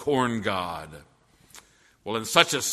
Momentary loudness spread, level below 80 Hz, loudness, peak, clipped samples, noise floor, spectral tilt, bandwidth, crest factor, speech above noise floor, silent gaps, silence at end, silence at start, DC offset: 20 LU; -60 dBFS; -24 LUFS; 0 dBFS; under 0.1%; -53 dBFS; -2.5 dB/octave; 13.5 kHz; 28 dB; 28 dB; none; 0 s; 0 s; under 0.1%